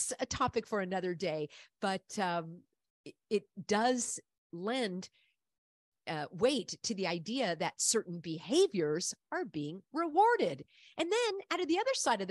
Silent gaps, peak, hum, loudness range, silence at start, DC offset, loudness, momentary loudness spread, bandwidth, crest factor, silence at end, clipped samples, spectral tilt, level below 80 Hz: 2.90-3.04 s, 4.38-4.50 s, 5.58-5.92 s; -16 dBFS; none; 5 LU; 0 s; under 0.1%; -34 LUFS; 12 LU; 12 kHz; 18 dB; 0 s; under 0.1%; -3.5 dB/octave; -68 dBFS